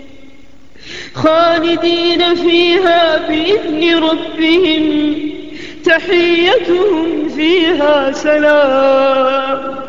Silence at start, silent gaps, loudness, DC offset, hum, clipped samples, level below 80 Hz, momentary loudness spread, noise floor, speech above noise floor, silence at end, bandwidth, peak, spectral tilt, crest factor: 0.8 s; none; -12 LUFS; 2%; none; under 0.1%; -46 dBFS; 8 LU; -43 dBFS; 31 dB; 0 s; 7.6 kHz; 0 dBFS; -4.5 dB/octave; 12 dB